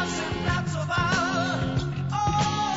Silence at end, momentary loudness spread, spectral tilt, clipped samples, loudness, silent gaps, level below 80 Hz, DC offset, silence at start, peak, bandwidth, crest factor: 0 s; 4 LU; -5 dB/octave; under 0.1%; -26 LUFS; none; -42 dBFS; 0.2%; 0 s; -12 dBFS; 8 kHz; 14 dB